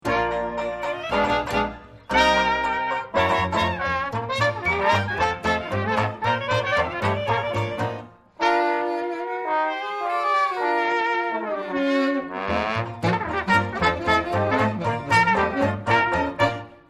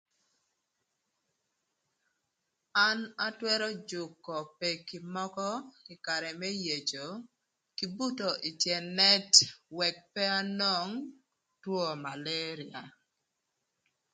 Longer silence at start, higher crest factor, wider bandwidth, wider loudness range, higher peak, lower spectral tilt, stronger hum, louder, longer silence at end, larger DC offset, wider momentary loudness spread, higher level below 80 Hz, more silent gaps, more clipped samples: second, 0.05 s vs 2.75 s; second, 18 dB vs 30 dB; first, 14 kHz vs 11 kHz; second, 3 LU vs 9 LU; about the same, -6 dBFS vs -4 dBFS; first, -5.5 dB/octave vs -1.5 dB/octave; neither; first, -23 LUFS vs -30 LUFS; second, 0.15 s vs 1.25 s; neither; second, 7 LU vs 18 LU; first, -46 dBFS vs -82 dBFS; neither; neither